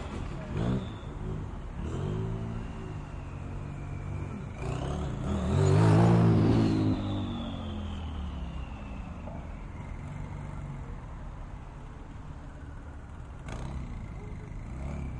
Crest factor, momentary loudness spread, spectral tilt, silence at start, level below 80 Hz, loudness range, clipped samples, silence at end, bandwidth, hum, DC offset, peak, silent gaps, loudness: 18 dB; 21 LU; -8 dB/octave; 0 s; -42 dBFS; 16 LU; under 0.1%; 0 s; 10.5 kHz; none; under 0.1%; -14 dBFS; none; -32 LUFS